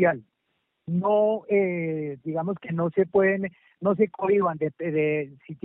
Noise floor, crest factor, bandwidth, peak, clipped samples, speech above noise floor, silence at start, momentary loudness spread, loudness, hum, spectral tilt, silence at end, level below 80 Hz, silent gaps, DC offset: -76 dBFS; 16 dB; 3.7 kHz; -8 dBFS; under 0.1%; 51 dB; 0 s; 9 LU; -25 LUFS; none; -7.5 dB/octave; 0.1 s; -68 dBFS; none; under 0.1%